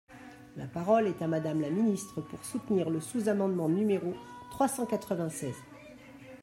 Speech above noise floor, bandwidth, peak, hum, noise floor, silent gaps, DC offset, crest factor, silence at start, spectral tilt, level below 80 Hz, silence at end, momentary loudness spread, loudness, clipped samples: 20 dB; 16 kHz; -14 dBFS; none; -51 dBFS; none; under 0.1%; 18 dB; 0.1 s; -6.5 dB/octave; -68 dBFS; 0 s; 22 LU; -31 LUFS; under 0.1%